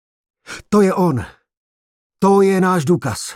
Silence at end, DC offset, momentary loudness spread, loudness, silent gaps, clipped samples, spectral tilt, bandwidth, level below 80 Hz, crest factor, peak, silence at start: 0 s; under 0.1%; 20 LU; -16 LUFS; 1.57-2.10 s; under 0.1%; -6.5 dB/octave; 15 kHz; -52 dBFS; 14 dB; -2 dBFS; 0.5 s